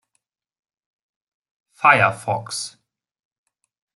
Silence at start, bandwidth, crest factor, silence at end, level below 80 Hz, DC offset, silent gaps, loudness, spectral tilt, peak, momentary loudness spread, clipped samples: 1.8 s; 12 kHz; 24 dB; 1.25 s; -68 dBFS; under 0.1%; none; -18 LUFS; -3.5 dB/octave; -2 dBFS; 14 LU; under 0.1%